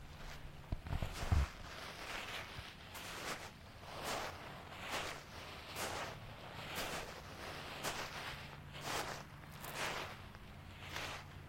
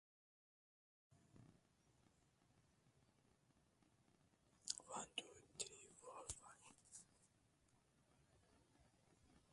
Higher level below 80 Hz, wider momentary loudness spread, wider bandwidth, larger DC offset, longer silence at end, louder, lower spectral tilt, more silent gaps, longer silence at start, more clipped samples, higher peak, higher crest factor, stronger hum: first, -52 dBFS vs -80 dBFS; about the same, 11 LU vs 13 LU; first, 16.5 kHz vs 11.5 kHz; neither; about the same, 0 s vs 0 s; first, -45 LUFS vs -54 LUFS; first, -3.5 dB/octave vs -1 dB/octave; neither; second, 0 s vs 1.1 s; neither; about the same, -22 dBFS vs -24 dBFS; second, 24 dB vs 38 dB; neither